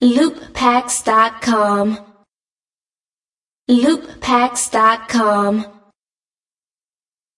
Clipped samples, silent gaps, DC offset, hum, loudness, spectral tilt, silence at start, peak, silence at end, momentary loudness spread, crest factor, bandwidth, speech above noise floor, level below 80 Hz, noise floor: under 0.1%; 2.50-2.56 s, 3.25-3.29 s, 3.47-3.52 s, 3.59-3.65 s; under 0.1%; none; -15 LUFS; -3.5 dB/octave; 0 s; 0 dBFS; 1.65 s; 7 LU; 16 dB; 11.5 kHz; over 75 dB; -52 dBFS; under -90 dBFS